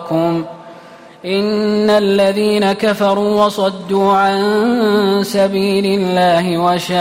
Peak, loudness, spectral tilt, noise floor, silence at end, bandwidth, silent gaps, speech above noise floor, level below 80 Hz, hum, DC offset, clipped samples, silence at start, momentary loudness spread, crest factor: -4 dBFS; -14 LUFS; -5.5 dB/octave; -38 dBFS; 0 s; 16 kHz; none; 24 dB; -54 dBFS; none; under 0.1%; under 0.1%; 0 s; 5 LU; 10 dB